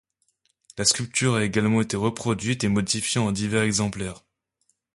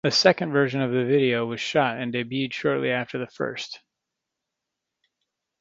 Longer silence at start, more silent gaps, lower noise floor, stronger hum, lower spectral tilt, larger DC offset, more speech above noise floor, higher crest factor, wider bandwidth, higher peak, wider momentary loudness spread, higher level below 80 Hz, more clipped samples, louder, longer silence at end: first, 0.75 s vs 0.05 s; neither; second, -72 dBFS vs -84 dBFS; neither; about the same, -4 dB/octave vs -5 dB/octave; neither; second, 48 dB vs 60 dB; about the same, 20 dB vs 24 dB; first, 11.5 kHz vs 7.8 kHz; second, -6 dBFS vs 0 dBFS; second, 6 LU vs 11 LU; first, -52 dBFS vs -68 dBFS; neither; about the same, -23 LUFS vs -24 LUFS; second, 0.8 s vs 1.85 s